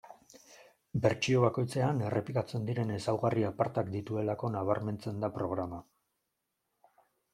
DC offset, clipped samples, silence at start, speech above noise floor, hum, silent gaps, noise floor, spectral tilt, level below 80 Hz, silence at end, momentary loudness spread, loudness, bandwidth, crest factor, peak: under 0.1%; under 0.1%; 0.05 s; 52 dB; none; none; -84 dBFS; -7 dB/octave; -66 dBFS; 1.5 s; 8 LU; -33 LUFS; 12.5 kHz; 20 dB; -12 dBFS